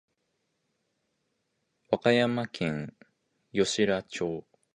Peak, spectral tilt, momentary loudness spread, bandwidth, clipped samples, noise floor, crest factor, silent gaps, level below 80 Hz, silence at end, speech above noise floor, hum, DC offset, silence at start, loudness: -10 dBFS; -4.5 dB/octave; 12 LU; 10.5 kHz; under 0.1%; -78 dBFS; 22 dB; none; -64 dBFS; 0.35 s; 51 dB; none; under 0.1%; 1.9 s; -28 LUFS